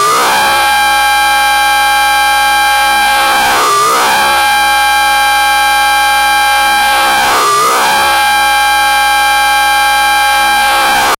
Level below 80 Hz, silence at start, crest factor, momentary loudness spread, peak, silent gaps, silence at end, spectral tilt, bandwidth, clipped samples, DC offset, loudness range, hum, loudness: -36 dBFS; 0 s; 8 dB; 0 LU; -2 dBFS; none; 0.05 s; 0 dB/octave; 16 kHz; under 0.1%; under 0.1%; 0 LU; none; -8 LUFS